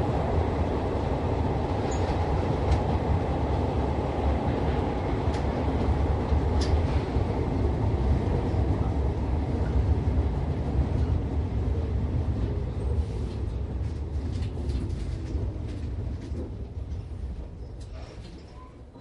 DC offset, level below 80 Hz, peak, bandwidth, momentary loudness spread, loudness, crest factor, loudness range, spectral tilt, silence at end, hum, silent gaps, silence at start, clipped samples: under 0.1%; -30 dBFS; -12 dBFS; 9 kHz; 11 LU; -28 LUFS; 14 dB; 7 LU; -8 dB/octave; 0 s; none; none; 0 s; under 0.1%